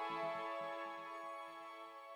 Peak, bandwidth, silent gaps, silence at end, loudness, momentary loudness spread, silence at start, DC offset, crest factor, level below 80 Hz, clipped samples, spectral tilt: -32 dBFS; over 20 kHz; none; 0 s; -46 LUFS; 10 LU; 0 s; under 0.1%; 14 dB; under -90 dBFS; under 0.1%; -4 dB/octave